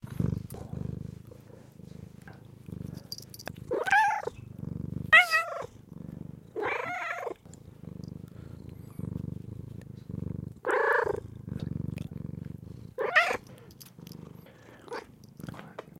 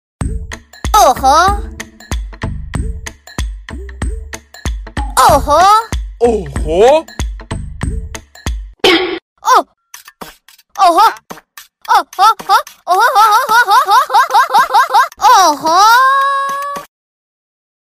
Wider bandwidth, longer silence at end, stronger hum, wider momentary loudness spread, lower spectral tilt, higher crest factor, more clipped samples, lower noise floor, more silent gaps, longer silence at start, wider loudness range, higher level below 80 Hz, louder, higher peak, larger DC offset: about the same, 16.5 kHz vs 16 kHz; second, 0.1 s vs 1.05 s; neither; first, 24 LU vs 18 LU; first, -5 dB/octave vs -3.5 dB/octave; first, 26 dB vs 12 dB; neither; first, -52 dBFS vs -41 dBFS; second, none vs 9.22-9.36 s; second, 0.05 s vs 0.2 s; first, 14 LU vs 7 LU; second, -54 dBFS vs -26 dBFS; second, -29 LUFS vs -10 LUFS; second, -8 dBFS vs 0 dBFS; neither